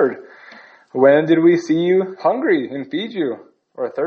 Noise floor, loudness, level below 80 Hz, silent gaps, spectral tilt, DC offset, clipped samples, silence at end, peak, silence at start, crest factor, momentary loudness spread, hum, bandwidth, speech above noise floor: -43 dBFS; -17 LUFS; -70 dBFS; none; -7 dB/octave; under 0.1%; under 0.1%; 0 s; 0 dBFS; 0 s; 18 dB; 14 LU; none; 7 kHz; 27 dB